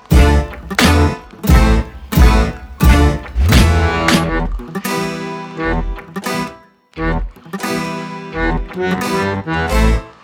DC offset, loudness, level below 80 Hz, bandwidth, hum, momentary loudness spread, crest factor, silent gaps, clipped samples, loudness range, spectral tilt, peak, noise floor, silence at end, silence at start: under 0.1%; -16 LUFS; -18 dBFS; 19.5 kHz; none; 12 LU; 14 dB; none; under 0.1%; 9 LU; -5.5 dB/octave; 0 dBFS; -39 dBFS; 0.15 s; 0.1 s